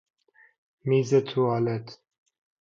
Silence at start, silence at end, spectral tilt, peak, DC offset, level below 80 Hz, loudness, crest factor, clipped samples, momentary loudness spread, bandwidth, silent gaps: 0.85 s; 0.65 s; -7 dB/octave; -10 dBFS; under 0.1%; -70 dBFS; -25 LUFS; 18 dB; under 0.1%; 13 LU; 7.6 kHz; none